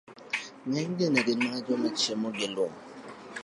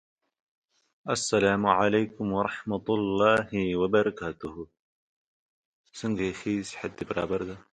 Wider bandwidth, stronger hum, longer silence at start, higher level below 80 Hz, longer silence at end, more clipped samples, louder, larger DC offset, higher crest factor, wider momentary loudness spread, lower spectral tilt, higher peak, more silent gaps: about the same, 11.5 kHz vs 10.5 kHz; neither; second, 0.1 s vs 1.05 s; second, -76 dBFS vs -58 dBFS; second, 0 s vs 0.15 s; neither; about the same, -29 LUFS vs -27 LUFS; neither; about the same, 20 dB vs 22 dB; about the same, 16 LU vs 14 LU; about the same, -4 dB/octave vs -5 dB/octave; second, -10 dBFS vs -6 dBFS; second, none vs 4.79-5.84 s